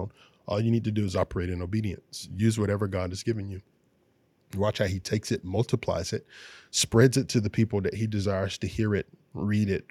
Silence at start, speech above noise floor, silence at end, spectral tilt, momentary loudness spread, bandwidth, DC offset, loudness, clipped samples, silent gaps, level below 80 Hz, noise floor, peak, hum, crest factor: 0 s; 40 dB; 0.1 s; -5.5 dB/octave; 14 LU; 14.5 kHz; under 0.1%; -28 LUFS; under 0.1%; none; -56 dBFS; -67 dBFS; -6 dBFS; none; 22 dB